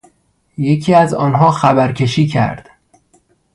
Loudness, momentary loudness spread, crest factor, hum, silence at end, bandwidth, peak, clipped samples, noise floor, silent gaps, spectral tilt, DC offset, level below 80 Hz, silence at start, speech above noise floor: -13 LUFS; 10 LU; 14 dB; none; 0.95 s; 11.5 kHz; 0 dBFS; under 0.1%; -57 dBFS; none; -7 dB/octave; under 0.1%; -48 dBFS; 0.6 s; 45 dB